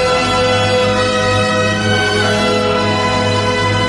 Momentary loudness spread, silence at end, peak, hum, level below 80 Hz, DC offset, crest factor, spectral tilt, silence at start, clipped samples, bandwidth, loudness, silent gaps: 1 LU; 0 s; -2 dBFS; none; -36 dBFS; under 0.1%; 12 dB; -4.5 dB/octave; 0 s; under 0.1%; 11.5 kHz; -13 LUFS; none